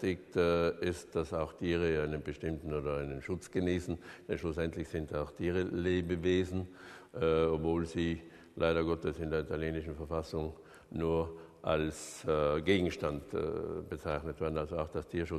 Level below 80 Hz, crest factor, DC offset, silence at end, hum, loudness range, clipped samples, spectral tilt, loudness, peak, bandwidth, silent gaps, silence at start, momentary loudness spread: -50 dBFS; 20 dB; under 0.1%; 0 s; none; 3 LU; under 0.1%; -6.5 dB/octave; -35 LUFS; -16 dBFS; 13 kHz; none; 0 s; 9 LU